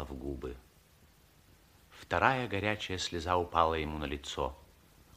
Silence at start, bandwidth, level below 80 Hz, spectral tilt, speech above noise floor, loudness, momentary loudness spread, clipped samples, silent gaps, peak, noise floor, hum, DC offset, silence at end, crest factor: 0 s; 15.5 kHz; -50 dBFS; -4.5 dB/octave; 30 dB; -33 LUFS; 14 LU; under 0.1%; none; -10 dBFS; -63 dBFS; none; under 0.1%; 0.55 s; 26 dB